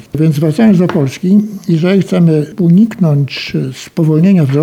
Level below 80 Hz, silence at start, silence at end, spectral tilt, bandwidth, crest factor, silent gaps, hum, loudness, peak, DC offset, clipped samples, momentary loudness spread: -50 dBFS; 0.15 s; 0 s; -8 dB/octave; 13.5 kHz; 10 dB; none; none; -11 LUFS; 0 dBFS; under 0.1%; under 0.1%; 7 LU